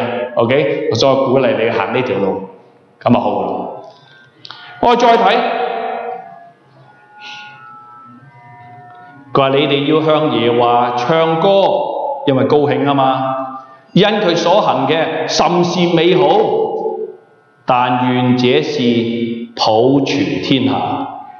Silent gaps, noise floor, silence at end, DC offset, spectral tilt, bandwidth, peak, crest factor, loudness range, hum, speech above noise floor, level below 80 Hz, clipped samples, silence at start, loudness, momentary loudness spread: none; -48 dBFS; 0 s; under 0.1%; -6 dB/octave; 7.2 kHz; 0 dBFS; 14 dB; 6 LU; none; 35 dB; -56 dBFS; under 0.1%; 0 s; -14 LUFS; 14 LU